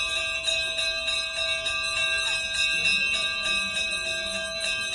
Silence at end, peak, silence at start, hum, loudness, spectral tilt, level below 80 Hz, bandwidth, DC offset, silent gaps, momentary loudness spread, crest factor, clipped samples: 0 s; -12 dBFS; 0 s; none; -24 LUFS; 0.5 dB/octave; -52 dBFS; 11.5 kHz; under 0.1%; none; 5 LU; 14 dB; under 0.1%